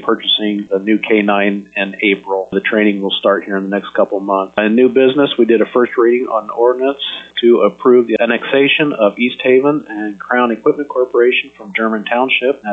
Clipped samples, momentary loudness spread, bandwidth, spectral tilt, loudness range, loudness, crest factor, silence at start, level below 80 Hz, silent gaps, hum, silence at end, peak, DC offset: under 0.1%; 7 LU; 4 kHz; -7 dB/octave; 2 LU; -14 LUFS; 12 dB; 0 s; -60 dBFS; none; none; 0 s; 0 dBFS; under 0.1%